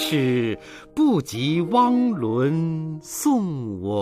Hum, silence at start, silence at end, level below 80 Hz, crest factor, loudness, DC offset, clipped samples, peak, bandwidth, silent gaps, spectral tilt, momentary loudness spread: none; 0 s; 0 s; -58 dBFS; 14 dB; -22 LUFS; under 0.1%; under 0.1%; -8 dBFS; 15.5 kHz; none; -6 dB/octave; 10 LU